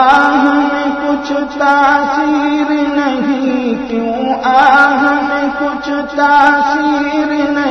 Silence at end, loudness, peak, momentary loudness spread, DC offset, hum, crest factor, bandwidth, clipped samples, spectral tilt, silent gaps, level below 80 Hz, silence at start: 0 s; -12 LUFS; 0 dBFS; 8 LU; under 0.1%; none; 12 dB; 7 kHz; 0.3%; -4.5 dB/octave; none; -46 dBFS; 0 s